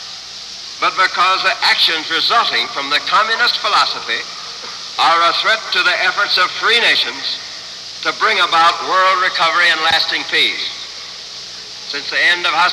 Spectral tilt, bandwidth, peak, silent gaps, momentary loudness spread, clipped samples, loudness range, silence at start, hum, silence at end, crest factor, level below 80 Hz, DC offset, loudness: 0 dB/octave; 13 kHz; -2 dBFS; none; 16 LU; under 0.1%; 2 LU; 0 s; none; 0 s; 14 dB; -60 dBFS; under 0.1%; -13 LUFS